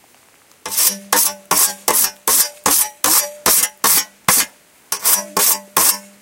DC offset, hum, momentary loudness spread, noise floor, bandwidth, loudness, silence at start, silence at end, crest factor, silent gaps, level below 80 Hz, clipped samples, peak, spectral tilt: under 0.1%; none; 2 LU; -51 dBFS; over 20 kHz; -14 LUFS; 0.65 s; 0.2 s; 18 dB; none; -54 dBFS; under 0.1%; 0 dBFS; 0.5 dB/octave